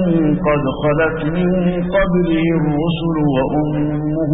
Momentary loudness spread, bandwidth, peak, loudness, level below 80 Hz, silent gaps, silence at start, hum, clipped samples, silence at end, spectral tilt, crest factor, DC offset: 3 LU; 4 kHz; -4 dBFS; -17 LUFS; -32 dBFS; none; 0 s; none; under 0.1%; 0 s; -7 dB/octave; 12 dB; under 0.1%